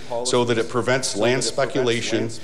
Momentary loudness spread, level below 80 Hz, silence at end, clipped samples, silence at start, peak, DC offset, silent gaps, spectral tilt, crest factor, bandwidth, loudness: 2 LU; -58 dBFS; 0 s; under 0.1%; 0 s; -8 dBFS; 3%; none; -4 dB/octave; 14 dB; 13 kHz; -21 LUFS